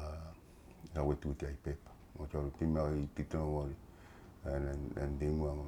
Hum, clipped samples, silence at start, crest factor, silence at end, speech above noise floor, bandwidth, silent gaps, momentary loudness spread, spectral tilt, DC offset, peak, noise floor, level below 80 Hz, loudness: none; under 0.1%; 0 s; 18 dB; 0 s; 20 dB; 11.5 kHz; none; 20 LU; -8.5 dB/octave; under 0.1%; -20 dBFS; -57 dBFS; -46 dBFS; -40 LUFS